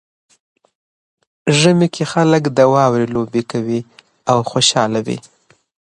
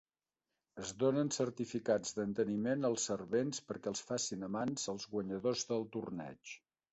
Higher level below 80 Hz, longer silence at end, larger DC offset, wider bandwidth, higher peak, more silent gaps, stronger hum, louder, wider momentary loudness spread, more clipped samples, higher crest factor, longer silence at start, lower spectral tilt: first, -56 dBFS vs -74 dBFS; first, 0.75 s vs 0.35 s; neither; first, 11 kHz vs 8.2 kHz; first, 0 dBFS vs -20 dBFS; neither; neither; first, -15 LUFS vs -38 LUFS; about the same, 11 LU vs 11 LU; neither; about the same, 16 dB vs 18 dB; first, 1.45 s vs 0.75 s; about the same, -5 dB/octave vs -4.5 dB/octave